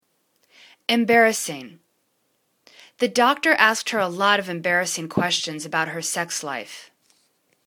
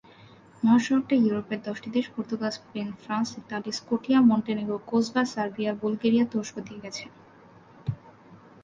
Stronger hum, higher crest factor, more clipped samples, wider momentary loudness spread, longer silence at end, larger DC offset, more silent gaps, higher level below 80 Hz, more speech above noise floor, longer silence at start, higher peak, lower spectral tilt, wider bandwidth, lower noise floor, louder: neither; first, 24 dB vs 18 dB; neither; about the same, 14 LU vs 15 LU; first, 0.85 s vs 0.25 s; neither; neither; about the same, -68 dBFS vs -64 dBFS; first, 48 dB vs 27 dB; first, 0.9 s vs 0.6 s; first, 0 dBFS vs -10 dBFS; second, -2.5 dB/octave vs -5.5 dB/octave; first, 19 kHz vs 7.6 kHz; first, -70 dBFS vs -53 dBFS; first, -21 LUFS vs -27 LUFS